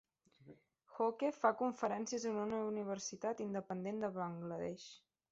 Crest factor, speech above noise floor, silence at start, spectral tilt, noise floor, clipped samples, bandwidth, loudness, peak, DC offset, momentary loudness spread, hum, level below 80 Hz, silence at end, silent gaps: 22 dB; 24 dB; 0.45 s; -5 dB/octave; -63 dBFS; under 0.1%; 8 kHz; -40 LUFS; -18 dBFS; under 0.1%; 9 LU; none; -80 dBFS; 0.35 s; none